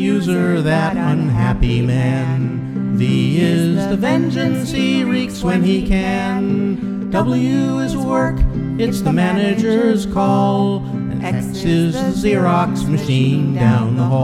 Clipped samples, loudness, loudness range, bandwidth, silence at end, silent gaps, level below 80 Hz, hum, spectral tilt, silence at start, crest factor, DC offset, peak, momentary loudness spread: under 0.1%; -17 LUFS; 1 LU; 14 kHz; 0 s; none; -30 dBFS; none; -7 dB/octave; 0 s; 14 dB; under 0.1%; -2 dBFS; 5 LU